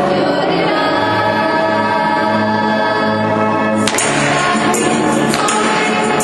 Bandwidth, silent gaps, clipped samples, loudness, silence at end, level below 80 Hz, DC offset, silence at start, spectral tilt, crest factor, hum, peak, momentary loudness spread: 12 kHz; none; under 0.1%; -14 LUFS; 0 s; -48 dBFS; under 0.1%; 0 s; -4 dB/octave; 14 dB; none; 0 dBFS; 1 LU